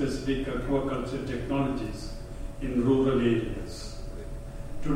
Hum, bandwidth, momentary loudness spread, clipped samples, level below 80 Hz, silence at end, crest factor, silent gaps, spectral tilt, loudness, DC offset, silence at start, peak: none; 14 kHz; 17 LU; under 0.1%; -38 dBFS; 0 s; 16 dB; none; -7 dB/octave; -29 LUFS; under 0.1%; 0 s; -12 dBFS